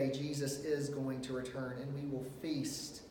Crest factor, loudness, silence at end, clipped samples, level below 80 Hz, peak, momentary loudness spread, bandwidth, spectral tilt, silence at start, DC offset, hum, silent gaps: 16 dB; -40 LUFS; 0 s; under 0.1%; -66 dBFS; -24 dBFS; 5 LU; 18 kHz; -5.5 dB/octave; 0 s; under 0.1%; none; none